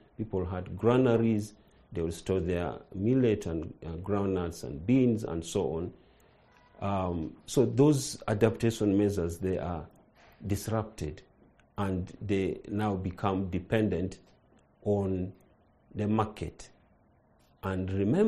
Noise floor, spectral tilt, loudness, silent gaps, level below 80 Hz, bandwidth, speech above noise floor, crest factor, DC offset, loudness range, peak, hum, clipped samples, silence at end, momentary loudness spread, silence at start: -64 dBFS; -7 dB/octave; -31 LUFS; none; -52 dBFS; 13 kHz; 35 dB; 22 dB; under 0.1%; 6 LU; -8 dBFS; none; under 0.1%; 0 s; 14 LU; 0.2 s